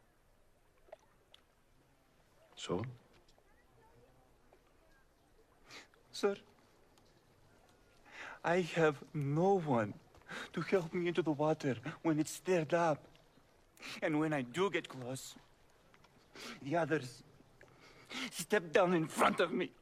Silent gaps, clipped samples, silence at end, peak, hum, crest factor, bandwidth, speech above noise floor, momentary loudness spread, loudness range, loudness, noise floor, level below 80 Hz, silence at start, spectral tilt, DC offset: none; under 0.1%; 0.1 s; -16 dBFS; none; 22 dB; 15 kHz; 34 dB; 19 LU; 14 LU; -36 LUFS; -70 dBFS; -72 dBFS; 2.55 s; -5.5 dB/octave; under 0.1%